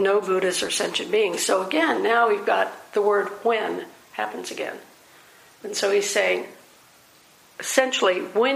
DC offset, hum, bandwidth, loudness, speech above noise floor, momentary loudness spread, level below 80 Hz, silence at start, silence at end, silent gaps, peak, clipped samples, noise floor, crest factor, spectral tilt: under 0.1%; none; 15.5 kHz; -23 LUFS; 31 dB; 12 LU; -74 dBFS; 0 s; 0 s; none; -2 dBFS; under 0.1%; -54 dBFS; 22 dB; -2 dB/octave